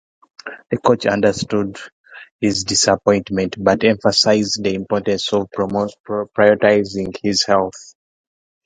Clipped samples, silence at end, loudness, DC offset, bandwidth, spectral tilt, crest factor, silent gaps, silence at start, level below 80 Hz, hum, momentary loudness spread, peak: under 0.1%; 0.8 s; -17 LUFS; under 0.1%; 9.6 kHz; -4 dB/octave; 18 dB; 1.92-2.04 s, 2.32-2.39 s, 6.00-6.04 s; 0.45 s; -50 dBFS; none; 11 LU; 0 dBFS